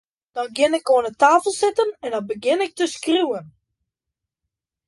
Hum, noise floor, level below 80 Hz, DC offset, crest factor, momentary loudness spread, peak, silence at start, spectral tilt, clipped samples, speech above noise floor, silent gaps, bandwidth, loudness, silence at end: none; -84 dBFS; -68 dBFS; under 0.1%; 18 dB; 12 LU; -4 dBFS; 0.35 s; -3 dB/octave; under 0.1%; 65 dB; none; 11.5 kHz; -20 LUFS; 1.4 s